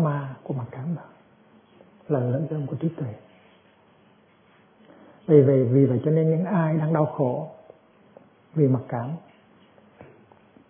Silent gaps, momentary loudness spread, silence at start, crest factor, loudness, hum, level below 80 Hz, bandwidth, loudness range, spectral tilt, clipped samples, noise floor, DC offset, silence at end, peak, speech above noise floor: none; 16 LU; 0 s; 22 dB; -24 LUFS; none; -70 dBFS; 3.6 kHz; 10 LU; -13.5 dB/octave; under 0.1%; -58 dBFS; under 0.1%; 1.5 s; -4 dBFS; 36 dB